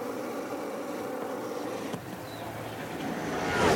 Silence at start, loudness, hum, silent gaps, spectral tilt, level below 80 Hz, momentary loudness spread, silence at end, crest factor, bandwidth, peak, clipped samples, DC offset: 0 s; -35 LUFS; none; none; -4.5 dB/octave; -56 dBFS; 7 LU; 0 s; 20 dB; 19 kHz; -12 dBFS; under 0.1%; under 0.1%